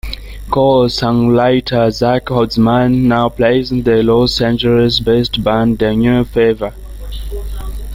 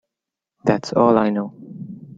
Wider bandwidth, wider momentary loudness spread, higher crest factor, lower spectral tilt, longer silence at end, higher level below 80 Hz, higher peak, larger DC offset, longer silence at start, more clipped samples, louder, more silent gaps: first, 16 kHz vs 7.8 kHz; second, 15 LU vs 20 LU; second, 12 dB vs 20 dB; about the same, -7 dB/octave vs -7 dB/octave; about the same, 0 s vs 0.05 s; first, -28 dBFS vs -58 dBFS; about the same, 0 dBFS vs -2 dBFS; neither; second, 0.05 s vs 0.65 s; neither; first, -13 LUFS vs -19 LUFS; neither